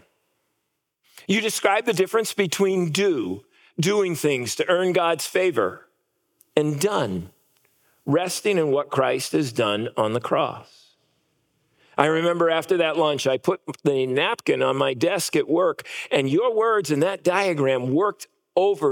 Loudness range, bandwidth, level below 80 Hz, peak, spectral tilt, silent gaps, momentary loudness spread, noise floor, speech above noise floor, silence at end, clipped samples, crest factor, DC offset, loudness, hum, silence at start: 3 LU; 18 kHz; -76 dBFS; 0 dBFS; -4.5 dB/octave; none; 6 LU; -77 dBFS; 55 dB; 0 s; under 0.1%; 22 dB; under 0.1%; -22 LUFS; none; 1.15 s